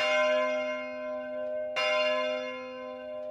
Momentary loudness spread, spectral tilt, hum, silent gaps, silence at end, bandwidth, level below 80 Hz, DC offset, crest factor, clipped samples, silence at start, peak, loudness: 13 LU; -1.5 dB/octave; none; none; 0 s; 9.4 kHz; -74 dBFS; under 0.1%; 14 dB; under 0.1%; 0 s; -16 dBFS; -30 LUFS